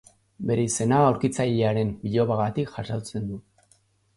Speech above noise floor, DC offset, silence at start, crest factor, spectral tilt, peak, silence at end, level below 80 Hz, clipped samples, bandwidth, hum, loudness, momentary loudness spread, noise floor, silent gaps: 40 dB; under 0.1%; 0.4 s; 18 dB; -6 dB/octave; -6 dBFS; 0.75 s; -54 dBFS; under 0.1%; 11.5 kHz; none; -25 LUFS; 13 LU; -63 dBFS; none